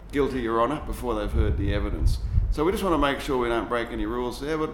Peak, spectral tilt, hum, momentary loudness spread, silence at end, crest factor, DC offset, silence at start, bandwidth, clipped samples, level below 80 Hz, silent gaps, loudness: -10 dBFS; -6.5 dB/octave; none; 6 LU; 0 s; 16 dB; under 0.1%; 0 s; 17.5 kHz; under 0.1%; -30 dBFS; none; -26 LUFS